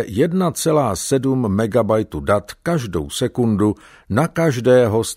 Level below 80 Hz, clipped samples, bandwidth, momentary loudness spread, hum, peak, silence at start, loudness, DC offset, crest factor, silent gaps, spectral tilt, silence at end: -44 dBFS; under 0.1%; 16 kHz; 8 LU; none; -2 dBFS; 0 s; -18 LUFS; under 0.1%; 16 dB; none; -6 dB/octave; 0 s